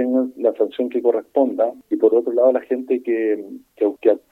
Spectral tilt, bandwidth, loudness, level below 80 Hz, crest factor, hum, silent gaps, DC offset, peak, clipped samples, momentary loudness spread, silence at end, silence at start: -7 dB/octave; 4.1 kHz; -20 LUFS; -72 dBFS; 16 dB; none; none; under 0.1%; -4 dBFS; under 0.1%; 6 LU; 0.15 s; 0 s